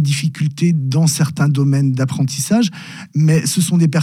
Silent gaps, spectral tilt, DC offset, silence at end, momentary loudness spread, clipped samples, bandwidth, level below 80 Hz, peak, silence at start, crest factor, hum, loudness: none; -5.5 dB/octave; under 0.1%; 0 s; 5 LU; under 0.1%; 15.5 kHz; -62 dBFS; -4 dBFS; 0 s; 10 dB; none; -16 LUFS